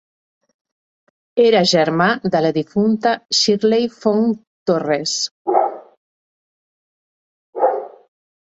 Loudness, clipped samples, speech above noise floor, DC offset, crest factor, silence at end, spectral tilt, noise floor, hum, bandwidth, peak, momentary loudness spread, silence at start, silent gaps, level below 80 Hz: -17 LUFS; under 0.1%; over 74 dB; under 0.1%; 18 dB; 0.65 s; -4 dB/octave; under -90 dBFS; none; 8 kHz; -2 dBFS; 10 LU; 1.35 s; 4.47-4.66 s, 5.31-5.45 s, 5.97-7.53 s; -64 dBFS